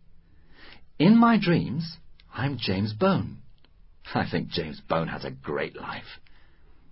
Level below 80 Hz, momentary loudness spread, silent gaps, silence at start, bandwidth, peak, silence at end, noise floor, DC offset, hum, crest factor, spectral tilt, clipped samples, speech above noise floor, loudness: -52 dBFS; 19 LU; none; 0.1 s; 5.8 kHz; -8 dBFS; 0 s; -52 dBFS; under 0.1%; none; 18 dB; -11 dB/octave; under 0.1%; 27 dB; -25 LUFS